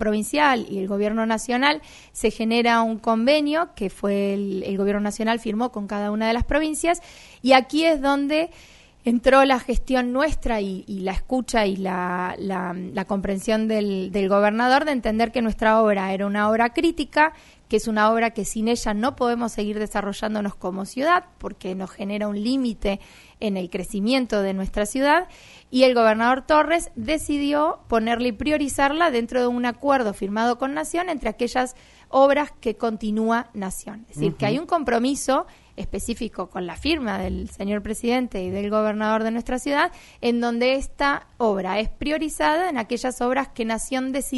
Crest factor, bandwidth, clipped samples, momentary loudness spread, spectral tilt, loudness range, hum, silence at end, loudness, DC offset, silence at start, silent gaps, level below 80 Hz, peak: 22 dB; 11.5 kHz; under 0.1%; 10 LU; -4.5 dB/octave; 5 LU; none; 0 s; -22 LUFS; under 0.1%; 0 s; none; -40 dBFS; 0 dBFS